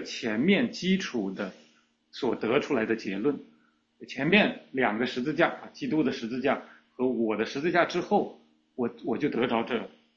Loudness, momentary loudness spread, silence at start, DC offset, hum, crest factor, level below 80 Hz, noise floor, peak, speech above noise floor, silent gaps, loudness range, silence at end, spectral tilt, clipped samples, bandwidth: -28 LUFS; 10 LU; 0 s; under 0.1%; none; 22 dB; -68 dBFS; -64 dBFS; -6 dBFS; 37 dB; none; 3 LU; 0.3 s; -5.5 dB/octave; under 0.1%; 7.6 kHz